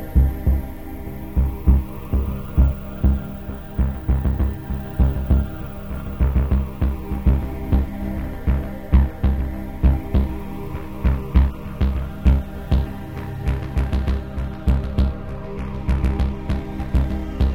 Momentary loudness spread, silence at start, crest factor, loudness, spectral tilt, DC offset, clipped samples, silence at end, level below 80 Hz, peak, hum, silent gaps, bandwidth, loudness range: 11 LU; 0 s; 18 dB; -23 LUFS; -9 dB/octave; under 0.1%; under 0.1%; 0 s; -22 dBFS; -2 dBFS; none; none; over 20 kHz; 2 LU